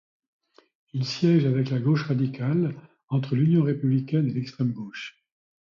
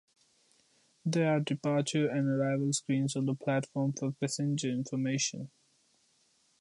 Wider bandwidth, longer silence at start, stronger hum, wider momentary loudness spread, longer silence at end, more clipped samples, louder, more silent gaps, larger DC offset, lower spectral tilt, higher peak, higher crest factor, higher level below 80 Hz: second, 7.2 kHz vs 11.5 kHz; about the same, 0.95 s vs 1.05 s; neither; first, 14 LU vs 4 LU; second, 0.6 s vs 1.15 s; neither; first, -25 LUFS vs -32 LUFS; first, 3.04-3.08 s vs none; neither; first, -8 dB/octave vs -5 dB/octave; first, -10 dBFS vs -16 dBFS; about the same, 16 dB vs 16 dB; first, -66 dBFS vs -78 dBFS